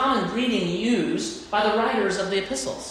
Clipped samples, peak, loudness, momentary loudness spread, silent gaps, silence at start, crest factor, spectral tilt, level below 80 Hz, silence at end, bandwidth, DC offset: under 0.1%; -10 dBFS; -24 LUFS; 6 LU; none; 0 s; 14 dB; -4 dB/octave; -54 dBFS; 0 s; 14 kHz; under 0.1%